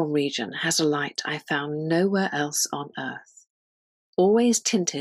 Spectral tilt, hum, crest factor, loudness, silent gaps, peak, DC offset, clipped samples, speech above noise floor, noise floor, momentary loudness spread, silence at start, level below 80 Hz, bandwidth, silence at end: -3.5 dB/octave; none; 16 dB; -24 LUFS; 3.50-4.13 s; -10 dBFS; under 0.1%; under 0.1%; over 66 dB; under -90 dBFS; 12 LU; 0 s; -74 dBFS; 15.5 kHz; 0 s